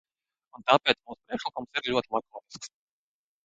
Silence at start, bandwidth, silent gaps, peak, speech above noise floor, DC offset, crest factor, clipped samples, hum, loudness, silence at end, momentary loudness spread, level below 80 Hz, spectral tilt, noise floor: 0.6 s; 9.2 kHz; none; -4 dBFS; over 61 dB; under 0.1%; 26 dB; under 0.1%; none; -28 LUFS; 0.75 s; 20 LU; -68 dBFS; -3.5 dB/octave; under -90 dBFS